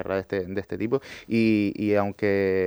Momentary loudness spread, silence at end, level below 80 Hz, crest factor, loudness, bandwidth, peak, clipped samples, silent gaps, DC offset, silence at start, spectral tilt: 7 LU; 0 s; -60 dBFS; 16 dB; -25 LUFS; over 20 kHz; -8 dBFS; under 0.1%; none; under 0.1%; 0 s; -8 dB/octave